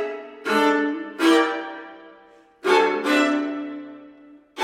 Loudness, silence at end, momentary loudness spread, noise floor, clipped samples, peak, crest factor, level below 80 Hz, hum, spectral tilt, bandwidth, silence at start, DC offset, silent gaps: -21 LUFS; 0 s; 19 LU; -51 dBFS; under 0.1%; -6 dBFS; 18 dB; -76 dBFS; none; -3 dB/octave; 16 kHz; 0 s; under 0.1%; none